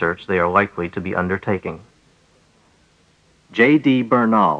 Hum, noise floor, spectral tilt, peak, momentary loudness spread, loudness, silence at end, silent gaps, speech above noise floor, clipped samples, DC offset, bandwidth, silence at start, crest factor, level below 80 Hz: none; -57 dBFS; -8 dB/octave; -2 dBFS; 12 LU; -18 LUFS; 0 s; none; 39 dB; under 0.1%; under 0.1%; 8 kHz; 0 s; 18 dB; -54 dBFS